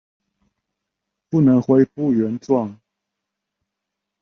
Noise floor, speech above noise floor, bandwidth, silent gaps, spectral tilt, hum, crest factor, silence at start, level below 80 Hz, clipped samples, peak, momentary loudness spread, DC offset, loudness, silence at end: -82 dBFS; 65 dB; 6.6 kHz; none; -10.5 dB/octave; none; 18 dB; 1.3 s; -62 dBFS; under 0.1%; -4 dBFS; 7 LU; under 0.1%; -18 LUFS; 1.5 s